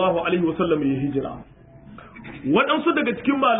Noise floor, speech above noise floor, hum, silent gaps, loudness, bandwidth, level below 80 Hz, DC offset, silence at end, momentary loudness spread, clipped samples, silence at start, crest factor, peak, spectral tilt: -44 dBFS; 23 dB; none; none; -22 LUFS; 3.9 kHz; -52 dBFS; under 0.1%; 0 s; 20 LU; under 0.1%; 0 s; 18 dB; -6 dBFS; -11 dB/octave